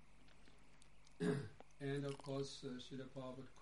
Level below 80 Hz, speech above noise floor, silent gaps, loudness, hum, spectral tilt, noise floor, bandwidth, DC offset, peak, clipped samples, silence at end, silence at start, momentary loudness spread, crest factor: -72 dBFS; 18 dB; none; -47 LUFS; none; -6 dB/octave; -68 dBFS; 11.5 kHz; 0.1%; -28 dBFS; under 0.1%; 0 s; 0 s; 25 LU; 20 dB